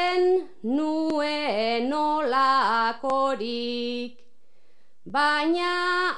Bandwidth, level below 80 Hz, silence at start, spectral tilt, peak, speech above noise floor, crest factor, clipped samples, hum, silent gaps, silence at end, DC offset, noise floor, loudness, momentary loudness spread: 10 kHz; -74 dBFS; 0 s; -4 dB/octave; -10 dBFS; 43 dB; 14 dB; under 0.1%; none; none; 0 s; 0.9%; -68 dBFS; -24 LUFS; 8 LU